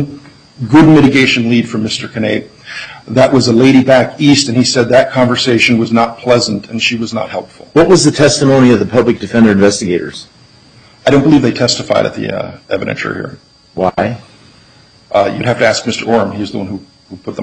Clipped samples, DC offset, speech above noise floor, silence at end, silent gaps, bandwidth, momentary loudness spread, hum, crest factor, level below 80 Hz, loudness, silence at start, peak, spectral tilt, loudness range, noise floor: under 0.1%; under 0.1%; 33 dB; 0 s; none; 10.5 kHz; 16 LU; none; 12 dB; -42 dBFS; -11 LUFS; 0 s; 0 dBFS; -5 dB/octave; 7 LU; -43 dBFS